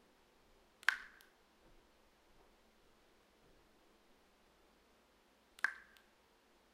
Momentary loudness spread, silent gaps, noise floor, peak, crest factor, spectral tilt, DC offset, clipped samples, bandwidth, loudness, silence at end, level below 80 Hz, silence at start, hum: 27 LU; none; -71 dBFS; -12 dBFS; 38 dB; 0 dB/octave; under 0.1%; under 0.1%; 15.5 kHz; -40 LUFS; 0.9 s; -78 dBFS; 0.9 s; none